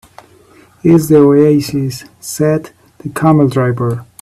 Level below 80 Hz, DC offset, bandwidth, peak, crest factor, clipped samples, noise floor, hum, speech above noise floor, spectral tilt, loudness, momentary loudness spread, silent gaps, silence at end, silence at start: -46 dBFS; under 0.1%; 14.5 kHz; 0 dBFS; 12 dB; under 0.1%; -45 dBFS; none; 33 dB; -7 dB/octave; -12 LUFS; 16 LU; none; 0.2 s; 0.85 s